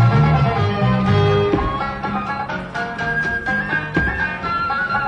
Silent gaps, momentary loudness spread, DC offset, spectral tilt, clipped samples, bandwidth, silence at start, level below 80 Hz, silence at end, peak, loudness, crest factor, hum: none; 8 LU; under 0.1%; -7.5 dB/octave; under 0.1%; 8.8 kHz; 0 s; -34 dBFS; 0 s; -6 dBFS; -19 LUFS; 12 dB; none